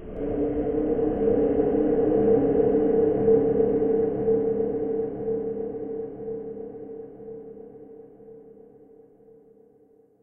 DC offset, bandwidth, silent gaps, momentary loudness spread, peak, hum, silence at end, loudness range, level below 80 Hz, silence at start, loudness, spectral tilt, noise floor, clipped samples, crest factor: under 0.1%; 3.1 kHz; none; 19 LU; -10 dBFS; none; 1.75 s; 18 LU; -46 dBFS; 0 s; -24 LUFS; -13 dB/octave; -58 dBFS; under 0.1%; 16 dB